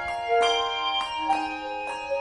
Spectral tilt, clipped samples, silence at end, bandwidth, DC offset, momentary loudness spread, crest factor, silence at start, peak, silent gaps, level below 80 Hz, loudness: -1.5 dB/octave; under 0.1%; 0 s; 10.5 kHz; under 0.1%; 9 LU; 16 dB; 0 s; -12 dBFS; none; -56 dBFS; -26 LUFS